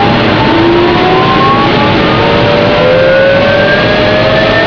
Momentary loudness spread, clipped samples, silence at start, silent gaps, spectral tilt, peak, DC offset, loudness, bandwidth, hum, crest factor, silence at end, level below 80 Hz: 1 LU; 0.3%; 0 s; none; -7 dB/octave; 0 dBFS; 0.9%; -7 LUFS; 5.4 kHz; none; 6 dB; 0 s; -28 dBFS